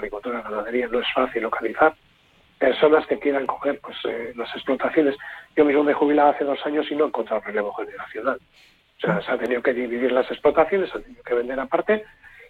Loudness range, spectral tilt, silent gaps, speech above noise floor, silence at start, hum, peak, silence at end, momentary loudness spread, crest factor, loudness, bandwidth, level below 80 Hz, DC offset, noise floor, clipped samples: 4 LU; -7 dB/octave; none; 35 dB; 0 s; none; -4 dBFS; 0.05 s; 11 LU; 18 dB; -22 LUFS; 4.7 kHz; -56 dBFS; under 0.1%; -58 dBFS; under 0.1%